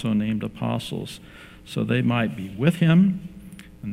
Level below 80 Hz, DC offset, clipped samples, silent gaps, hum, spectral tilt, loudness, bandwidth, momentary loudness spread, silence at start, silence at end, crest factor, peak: -52 dBFS; under 0.1%; under 0.1%; none; none; -7.5 dB/octave; -23 LUFS; 14 kHz; 23 LU; 0 s; 0 s; 18 dB; -4 dBFS